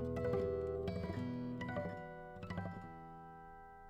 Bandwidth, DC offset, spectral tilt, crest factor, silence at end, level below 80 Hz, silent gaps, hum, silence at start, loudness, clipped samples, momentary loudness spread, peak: 13 kHz; under 0.1%; -8.5 dB/octave; 16 dB; 0 s; -58 dBFS; none; none; 0 s; -43 LUFS; under 0.1%; 16 LU; -26 dBFS